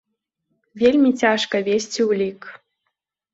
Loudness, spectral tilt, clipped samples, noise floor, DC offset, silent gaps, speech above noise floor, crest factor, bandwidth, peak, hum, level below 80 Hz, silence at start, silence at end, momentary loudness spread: -19 LUFS; -4 dB/octave; under 0.1%; -77 dBFS; under 0.1%; none; 59 dB; 18 dB; 8 kHz; -2 dBFS; none; -60 dBFS; 0.75 s; 0.75 s; 8 LU